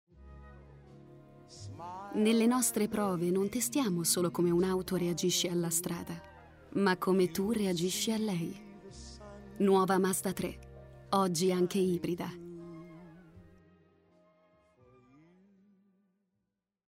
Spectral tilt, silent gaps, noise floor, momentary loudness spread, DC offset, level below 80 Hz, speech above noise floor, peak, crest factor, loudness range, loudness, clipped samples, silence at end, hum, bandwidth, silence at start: -4.5 dB/octave; none; -85 dBFS; 21 LU; under 0.1%; -62 dBFS; 54 dB; -14 dBFS; 18 dB; 4 LU; -31 LUFS; under 0.1%; 3.45 s; none; 16 kHz; 0.2 s